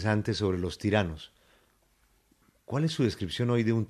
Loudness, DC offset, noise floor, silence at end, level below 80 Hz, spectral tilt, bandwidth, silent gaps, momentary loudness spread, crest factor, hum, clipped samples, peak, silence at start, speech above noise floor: -29 LUFS; under 0.1%; -67 dBFS; 0.05 s; -58 dBFS; -6.5 dB/octave; 13 kHz; none; 8 LU; 20 dB; none; under 0.1%; -10 dBFS; 0 s; 39 dB